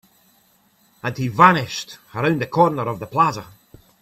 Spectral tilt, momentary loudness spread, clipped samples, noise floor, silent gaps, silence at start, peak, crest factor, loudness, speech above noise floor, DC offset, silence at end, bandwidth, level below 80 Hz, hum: -5.5 dB/octave; 16 LU; under 0.1%; -59 dBFS; none; 1.05 s; 0 dBFS; 20 dB; -19 LUFS; 40 dB; under 0.1%; 0.55 s; 15.5 kHz; -58 dBFS; none